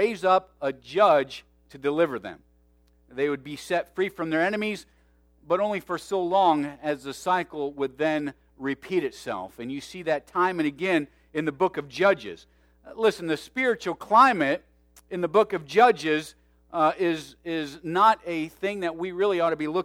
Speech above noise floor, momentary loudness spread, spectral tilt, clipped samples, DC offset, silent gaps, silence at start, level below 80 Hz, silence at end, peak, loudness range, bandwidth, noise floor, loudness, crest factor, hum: 36 dB; 14 LU; -5 dB/octave; under 0.1%; under 0.1%; none; 0 s; -62 dBFS; 0 s; -6 dBFS; 6 LU; 16 kHz; -61 dBFS; -25 LUFS; 20 dB; none